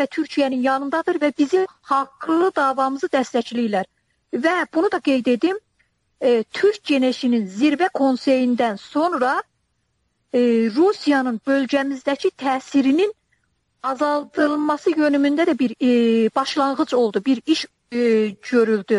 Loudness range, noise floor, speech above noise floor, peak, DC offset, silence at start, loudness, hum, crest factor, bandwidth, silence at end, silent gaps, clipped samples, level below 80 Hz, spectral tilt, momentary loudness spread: 2 LU; -70 dBFS; 51 dB; -6 dBFS; under 0.1%; 0 s; -20 LUFS; none; 14 dB; 11.5 kHz; 0 s; none; under 0.1%; -68 dBFS; -5 dB/octave; 5 LU